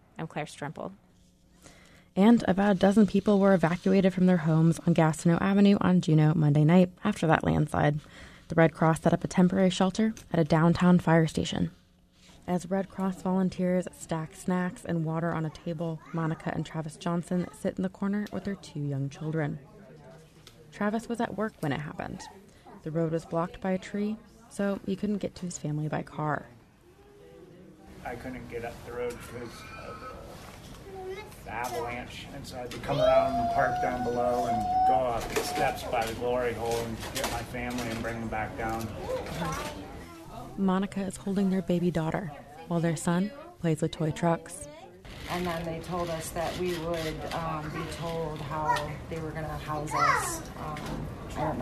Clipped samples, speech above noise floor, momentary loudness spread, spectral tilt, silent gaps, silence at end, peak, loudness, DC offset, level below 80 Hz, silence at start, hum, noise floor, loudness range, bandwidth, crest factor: under 0.1%; 32 dB; 17 LU; -6.5 dB/octave; none; 0 s; -6 dBFS; -28 LUFS; under 0.1%; -52 dBFS; 0.15 s; none; -60 dBFS; 12 LU; 13.5 kHz; 22 dB